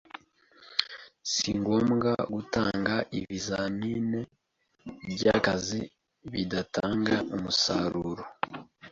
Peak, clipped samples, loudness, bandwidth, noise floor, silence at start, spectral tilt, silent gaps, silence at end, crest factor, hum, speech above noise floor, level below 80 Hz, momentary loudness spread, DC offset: -4 dBFS; under 0.1%; -29 LUFS; 7.8 kHz; -59 dBFS; 0.15 s; -4.5 dB/octave; none; 0 s; 26 dB; none; 30 dB; -56 dBFS; 17 LU; under 0.1%